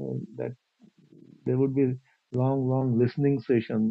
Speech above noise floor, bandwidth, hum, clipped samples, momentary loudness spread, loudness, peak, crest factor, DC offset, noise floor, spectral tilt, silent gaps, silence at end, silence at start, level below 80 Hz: 33 dB; 5.4 kHz; none; under 0.1%; 12 LU; -27 LUFS; -12 dBFS; 16 dB; under 0.1%; -58 dBFS; -11 dB/octave; none; 0 s; 0 s; -62 dBFS